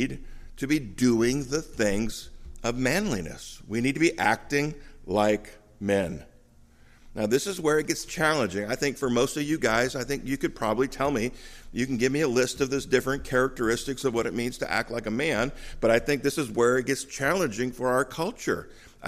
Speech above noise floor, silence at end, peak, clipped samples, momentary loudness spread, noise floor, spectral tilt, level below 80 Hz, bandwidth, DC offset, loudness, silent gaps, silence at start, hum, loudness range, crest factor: 28 dB; 0 s; -8 dBFS; under 0.1%; 9 LU; -55 dBFS; -4.5 dB/octave; -46 dBFS; 15.5 kHz; under 0.1%; -27 LUFS; none; 0 s; none; 2 LU; 18 dB